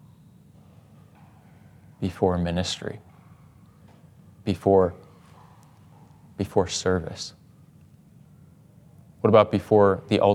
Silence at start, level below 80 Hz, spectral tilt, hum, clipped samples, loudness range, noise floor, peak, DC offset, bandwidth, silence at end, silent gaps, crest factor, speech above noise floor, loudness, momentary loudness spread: 2 s; -60 dBFS; -6 dB/octave; none; under 0.1%; 6 LU; -53 dBFS; -4 dBFS; under 0.1%; 13 kHz; 0 s; none; 24 dB; 31 dB; -23 LUFS; 17 LU